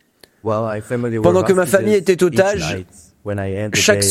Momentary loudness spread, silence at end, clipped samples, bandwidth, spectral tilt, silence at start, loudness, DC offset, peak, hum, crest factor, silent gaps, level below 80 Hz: 12 LU; 0 s; under 0.1%; 16 kHz; -4.5 dB/octave; 0.45 s; -17 LUFS; under 0.1%; 0 dBFS; none; 16 dB; none; -46 dBFS